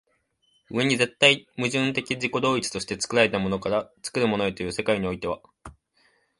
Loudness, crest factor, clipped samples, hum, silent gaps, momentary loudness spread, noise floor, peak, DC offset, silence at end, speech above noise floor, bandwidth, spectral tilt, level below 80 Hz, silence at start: -24 LUFS; 24 dB; under 0.1%; none; none; 11 LU; -69 dBFS; 0 dBFS; under 0.1%; 0.65 s; 44 dB; 11.5 kHz; -4 dB/octave; -54 dBFS; 0.7 s